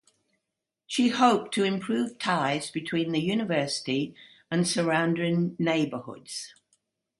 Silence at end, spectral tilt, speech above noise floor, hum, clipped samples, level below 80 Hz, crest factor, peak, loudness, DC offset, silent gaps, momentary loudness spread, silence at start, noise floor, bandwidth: 0.7 s; -5 dB/octave; 58 dB; none; under 0.1%; -72 dBFS; 20 dB; -8 dBFS; -27 LUFS; under 0.1%; none; 14 LU; 0.9 s; -85 dBFS; 11.5 kHz